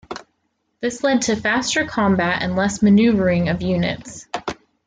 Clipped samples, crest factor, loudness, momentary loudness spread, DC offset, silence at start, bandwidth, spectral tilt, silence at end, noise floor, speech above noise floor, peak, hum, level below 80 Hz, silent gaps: under 0.1%; 14 dB; -19 LUFS; 16 LU; under 0.1%; 0.1 s; 9.4 kHz; -5 dB/octave; 0.35 s; -70 dBFS; 52 dB; -6 dBFS; none; -48 dBFS; none